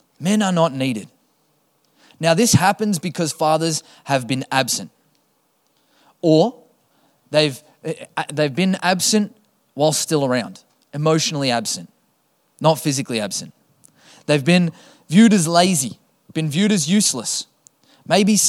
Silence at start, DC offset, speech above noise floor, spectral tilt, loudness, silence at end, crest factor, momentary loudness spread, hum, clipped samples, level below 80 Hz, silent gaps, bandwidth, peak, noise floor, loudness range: 0.2 s; under 0.1%; 46 dB; -4 dB/octave; -19 LUFS; 0 s; 20 dB; 13 LU; none; under 0.1%; -62 dBFS; none; 16 kHz; 0 dBFS; -64 dBFS; 5 LU